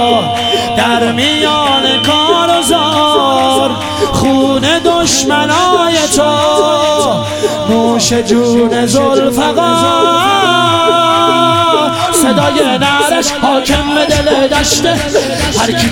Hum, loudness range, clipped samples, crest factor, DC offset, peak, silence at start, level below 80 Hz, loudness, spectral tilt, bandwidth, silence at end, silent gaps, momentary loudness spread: none; 1 LU; under 0.1%; 10 dB; under 0.1%; 0 dBFS; 0 s; -34 dBFS; -10 LUFS; -3.5 dB/octave; 18 kHz; 0 s; none; 3 LU